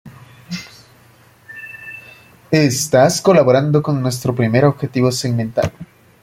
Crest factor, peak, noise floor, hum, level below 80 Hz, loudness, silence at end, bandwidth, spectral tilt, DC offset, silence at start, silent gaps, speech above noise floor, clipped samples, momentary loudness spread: 16 dB; 0 dBFS; -48 dBFS; none; -52 dBFS; -15 LUFS; 0.4 s; 16.5 kHz; -5.5 dB/octave; under 0.1%; 0.05 s; none; 34 dB; under 0.1%; 20 LU